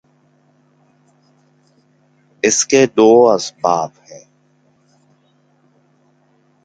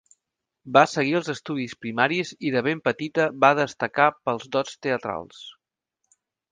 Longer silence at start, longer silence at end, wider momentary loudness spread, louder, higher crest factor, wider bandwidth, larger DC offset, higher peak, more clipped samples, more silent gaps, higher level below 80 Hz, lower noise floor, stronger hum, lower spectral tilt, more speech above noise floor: first, 2.45 s vs 0.65 s; first, 2.45 s vs 1 s; about the same, 10 LU vs 11 LU; first, -13 LUFS vs -23 LUFS; second, 18 dB vs 24 dB; about the same, 9.4 kHz vs 9.8 kHz; neither; about the same, 0 dBFS vs 0 dBFS; neither; neither; first, -62 dBFS vs -68 dBFS; second, -57 dBFS vs -83 dBFS; neither; second, -3.5 dB/octave vs -5 dB/octave; second, 44 dB vs 60 dB